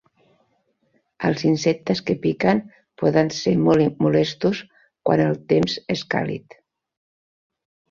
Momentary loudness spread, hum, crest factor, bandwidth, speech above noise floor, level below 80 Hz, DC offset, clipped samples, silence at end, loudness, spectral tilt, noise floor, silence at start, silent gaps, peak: 8 LU; none; 18 dB; 7.6 kHz; 48 dB; -56 dBFS; under 0.1%; under 0.1%; 1.5 s; -21 LUFS; -6.5 dB/octave; -67 dBFS; 1.2 s; none; -4 dBFS